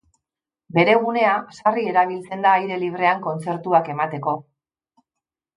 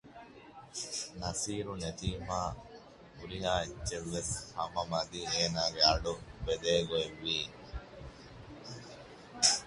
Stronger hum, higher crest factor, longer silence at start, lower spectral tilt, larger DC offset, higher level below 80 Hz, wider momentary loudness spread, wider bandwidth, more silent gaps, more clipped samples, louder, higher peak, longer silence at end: neither; second, 18 dB vs 26 dB; first, 0.75 s vs 0.05 s; first, -6.5 dB/octave vs -2.5 dB/octave; neither; second, -72 dBFS vs -50 dBFS; second, 9 LU vs 23 LU; about the same, 11 kHz vs 11.5 kHz; neither; neither; first, -20 LUFS vs -34 LUFS; first, -2 dBFS vs -10 dBFS; first, 1.15 s vs 0 s